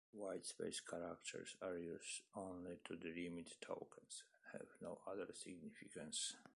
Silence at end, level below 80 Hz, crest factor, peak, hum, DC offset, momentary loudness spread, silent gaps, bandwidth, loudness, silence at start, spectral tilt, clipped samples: 0 s; -82 dBFS; 18 dB; -34 dBFS; none; under 0.1%; 8 LU; none; 11.5 kHz; -51 LUFS; 0.15 s; -3 dB/octave; under 0.1%